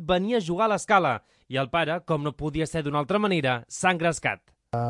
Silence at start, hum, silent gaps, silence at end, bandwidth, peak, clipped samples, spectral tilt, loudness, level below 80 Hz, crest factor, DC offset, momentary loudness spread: 0 s; none; none; 0 s; 11.5 kHz; -6 dBFS; under 0.1%; -5 dB/octave; -25 LUFS; -52 dBFS; 18 dB; under 0.1%; 8 LU